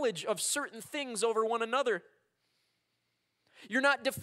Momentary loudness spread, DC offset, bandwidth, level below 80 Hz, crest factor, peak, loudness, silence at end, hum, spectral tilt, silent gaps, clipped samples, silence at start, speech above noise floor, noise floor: 9 LU; under 0.1%; 16 kHz; -90 dBFS; 20 dB; -14 dBFS; -32 LUFS; 0 s; none; -2 dB/octave; none; under 0.1%; 0 s; 48 dB; -80 dBFS